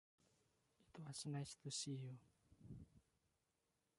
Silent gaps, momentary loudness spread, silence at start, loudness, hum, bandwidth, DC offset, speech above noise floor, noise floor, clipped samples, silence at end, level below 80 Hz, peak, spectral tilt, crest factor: none; 18 LU; 0.8 s; -52 LUFS; none; 11.5 kHz; under 0.1%; 38 dB; -88 dBFS; under 0.1%; 1 s; -78 dBFS; -36 dBFS; -4 dB/octave; 18 dB